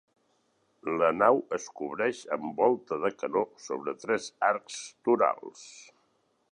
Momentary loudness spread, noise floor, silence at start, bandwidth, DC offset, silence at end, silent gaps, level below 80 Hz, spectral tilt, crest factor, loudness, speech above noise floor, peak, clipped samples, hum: 15 LU; -72 dBFS; 0.85 s; 11 kHz; under 0.1%; 0.7 s; none; -74 dBFS; -4.5 dB/octave; 22 dB; -29 LUFS; 43 dB; -8 dBFS; under 0.1%; none